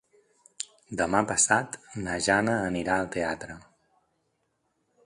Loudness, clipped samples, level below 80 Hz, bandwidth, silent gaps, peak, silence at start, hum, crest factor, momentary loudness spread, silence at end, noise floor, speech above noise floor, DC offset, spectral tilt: -26 LUFS; under 0.1%; -56 dBFS; 11.5 kHz; none; -6 dBFS; 0.6 s; none; 24 dB; 16 LU; 1.45 s; -75 dBFS; 48 dB; under 0.1%; -3 dB/octave